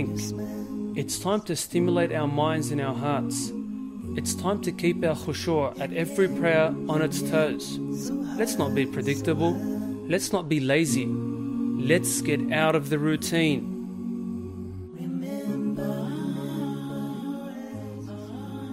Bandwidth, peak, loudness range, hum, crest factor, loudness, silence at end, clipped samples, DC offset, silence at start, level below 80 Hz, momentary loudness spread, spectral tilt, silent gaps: 16 kHz; -8 dBFS; 7 LU; none; 18 dB; -27 LUFS; 0 s; under 0.1%; under 0.1%; 0 s; -58 dBFS; 11 LU; -5 dB/octave; none